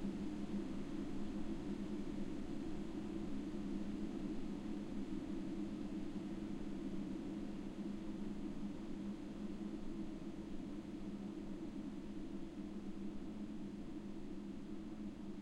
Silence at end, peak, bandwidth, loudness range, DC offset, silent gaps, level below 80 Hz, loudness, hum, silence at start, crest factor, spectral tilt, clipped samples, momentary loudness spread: 0 s; -30 dBFS; 11 kHz; 3 LU; under 0.1%; none; -54 dBFS; -47 LUFS; none; 0 s; 14 dB; -7.5 dB/octave; under 0.1%; 4 LU